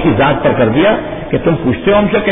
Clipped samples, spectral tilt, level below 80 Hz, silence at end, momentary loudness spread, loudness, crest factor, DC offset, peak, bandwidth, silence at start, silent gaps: under 0.1%; -11 dB/octave; -32 dBFS; 0 s; 5 LU; -12 LUFS; 10 dB; under 0.1%; 0 dBFS; 3.9 kHz; 0 s; none